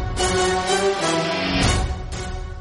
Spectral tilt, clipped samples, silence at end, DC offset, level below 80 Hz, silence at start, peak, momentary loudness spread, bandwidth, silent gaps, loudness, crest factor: -4 dB/octave; under 0.1%; 0 s; under 0.1%; -30 dBFS; 0 s; -6 dBFS; 11 LU; 11.5 kHz; none; -21 LUFS; 14 dB